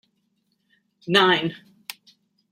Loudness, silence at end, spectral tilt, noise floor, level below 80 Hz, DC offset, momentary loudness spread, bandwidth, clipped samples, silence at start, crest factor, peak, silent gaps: -20 LUFS; 0.95 s; -4.5 dB/octave; -71 dBFS; -70 dBFS; under 0.1%; 22 LU; 16 kHz; under 0.1%; 1.05 s; 24 dB; -2 dBFS; none